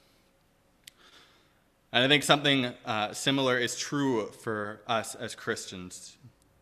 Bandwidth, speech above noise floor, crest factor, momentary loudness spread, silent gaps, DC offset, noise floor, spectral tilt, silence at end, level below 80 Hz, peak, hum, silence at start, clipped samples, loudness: 14.5 kHz; 37 dB; 26 dB; 16 LU; none; under 0.1%; -66 dBFS; -3.5 dB/octave; 0.35 s; -68 dBFS; -4 dBFS; none; 1.95 s; under 0.1%; -28 LUFS